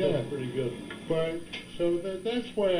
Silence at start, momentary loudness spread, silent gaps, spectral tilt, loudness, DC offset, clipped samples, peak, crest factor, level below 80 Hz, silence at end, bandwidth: 0 s; 8 LU; none; -6.5 dB/octave; -32 LUFS; under 0.1%; under 0.1%; -16 dBFS; 14 dB; -54 dBFS; 0 s; 15.5 kHz